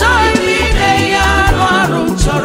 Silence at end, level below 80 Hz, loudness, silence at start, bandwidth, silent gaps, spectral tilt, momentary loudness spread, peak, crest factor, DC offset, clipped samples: 0 s; -18 dBFS; -11 LUFS; 0 s; 16.5 kHz; none; -4.5 dB/octave; 3 LU; 0 dBFS; 10 dB; under 0.1%; under 0.1%